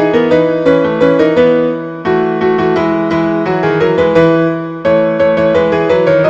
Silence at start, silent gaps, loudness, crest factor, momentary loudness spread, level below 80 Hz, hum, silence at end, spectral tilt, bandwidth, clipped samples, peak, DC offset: 0 s; none; -11 LUFS; 10 dB; 4 LU; -44 dBFS; none; 0 s; -8 dB/octave; 7.6 kHz; 0.2%; 0 dBFS; under 0.1%